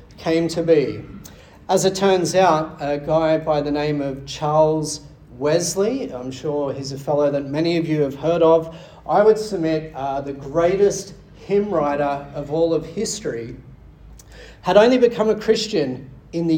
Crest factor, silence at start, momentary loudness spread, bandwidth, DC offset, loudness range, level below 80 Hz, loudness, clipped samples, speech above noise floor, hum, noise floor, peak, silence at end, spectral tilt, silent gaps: 18 dB; 0.1 s; 12 LU; 17.5 kHz; under 0.1%; 3 LU; -48 dBFS; -20 LUFS; under 0.1%; 24 dB; none; -43 dBFS; -2 dBFS; 0 s; -5 dB/octave; none